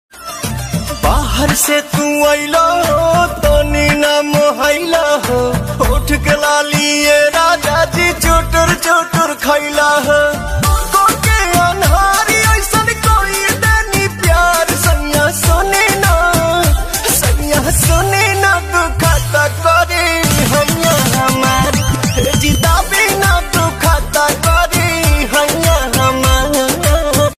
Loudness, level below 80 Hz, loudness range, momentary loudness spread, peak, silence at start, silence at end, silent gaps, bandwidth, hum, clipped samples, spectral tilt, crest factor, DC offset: -12 LUFS; -20 dBFS; 1 LU; 4 LU; 0 dBFS; 0.15 s; 0.05 s; none; 15.5 kHz; none; under 0.1%; -3.5 dB/octave; 12 dB; under 0.1%